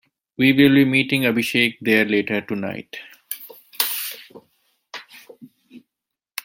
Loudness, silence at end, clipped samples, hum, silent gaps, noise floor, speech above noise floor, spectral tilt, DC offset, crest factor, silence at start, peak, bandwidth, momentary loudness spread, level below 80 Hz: -18 LUFS; 0.65 s; under 0.1%; none; none; -85 dBFS; 66 dB; -4.5 dB/octave; under 0.1%; 20 dB; 0.4 s; -2 dBFS; 17 kHz; 23 LU; -62 dBFS